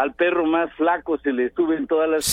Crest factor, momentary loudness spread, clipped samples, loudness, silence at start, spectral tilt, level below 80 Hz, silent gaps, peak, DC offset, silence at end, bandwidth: 14 dB; 3 LU; under 0.1%; -21 LUFS; 0 s; -3 dB/octave; -52 dBFS; none; -6 dBFS; under 0.1%; 0 s; 16.5 kHz